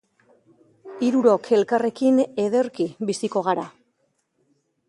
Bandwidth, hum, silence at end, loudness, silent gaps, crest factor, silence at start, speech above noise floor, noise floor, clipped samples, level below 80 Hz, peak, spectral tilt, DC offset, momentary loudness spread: 11.5 kHz; none; 1.2 s; -22 LUFS; none; 18 dB; 0.85 s; 50 dB; -70 dBFS; under 0.1%; -72 dBFS; -4 dBFS; -5.5 dB/octave; under 0.1%; 8 LU